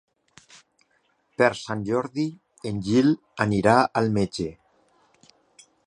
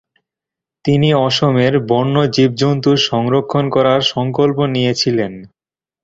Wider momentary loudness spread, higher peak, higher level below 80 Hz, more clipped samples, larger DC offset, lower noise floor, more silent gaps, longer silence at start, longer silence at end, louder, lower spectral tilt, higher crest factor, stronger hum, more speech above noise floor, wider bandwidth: first, 13 LU vs 3 LU; about the same, -2 dBFS vs 0 dBFS; second, -56 dBFS vs -50 dBFS; neither; neither; second, -68 dBFS vs -85 dBFS; neither; first, 1.4 s vs 0.85 s; first, 1.35 s vs 0.6 s; second, -24 LUFS vs -14 LUFS; about the same, -6.5 dB/octave vs -6 dB/octave; first, 22 dB vs 14 dB; neither; second, 45 dB vs 72 dB; first, 11 kHz vs 7.8 kHz